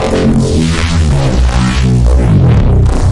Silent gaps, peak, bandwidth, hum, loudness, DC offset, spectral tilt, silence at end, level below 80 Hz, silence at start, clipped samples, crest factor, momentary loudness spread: none; 0 dBFS; 11.5 kHz; none; -10 LUFS; under 0.1%; -6.5 dB/octave; 0 s; -12 dBFS; 0 s; under 0.1%; 8 dB; 3 LU